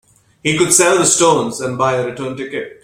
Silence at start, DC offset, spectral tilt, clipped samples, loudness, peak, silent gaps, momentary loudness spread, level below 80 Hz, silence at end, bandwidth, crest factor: 0.45 s; under 0.1%; -3 dB/octave; under 0.1%; -14 LUFS; 0 dBFS; none; 14 LU; -52 dBFS; 0.1 s; 16.5 kHz; 16 dB